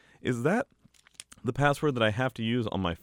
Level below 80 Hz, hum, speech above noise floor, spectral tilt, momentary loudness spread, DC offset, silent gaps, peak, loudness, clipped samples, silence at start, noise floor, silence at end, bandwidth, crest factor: -56 dBFS; none; 25 dB; -6 dB/octave; 13 LU; under 0.1%; none; -10 dBFS; -29 LUFS; under 0.1%; 0.25 s; -53 dBFS; 0.05 s; 16.5 kHz; 18 dB